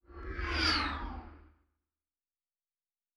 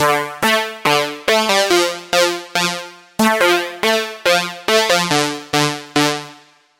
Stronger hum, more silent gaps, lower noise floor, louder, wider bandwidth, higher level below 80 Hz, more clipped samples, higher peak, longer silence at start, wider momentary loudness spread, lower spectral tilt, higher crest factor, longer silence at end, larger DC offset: neither; neither; first, under -90 dBFS vs -45 dBFS; second, -32 LUFS vs -16 LUFS; second, 11.5 kHz vs 17 kHz; first, -46 dBFS vs -56 dBFS; neither; second, -18 dBFS vs 0 dBFS; about the same, 0.1 s vs 0 s; first, 16 LU vs 5 LU; first, -4 dB/octave vs -2.5 dB/octave; first, 22 dB vs 16 dB; first, 1.75 s vs 0.45 s; neither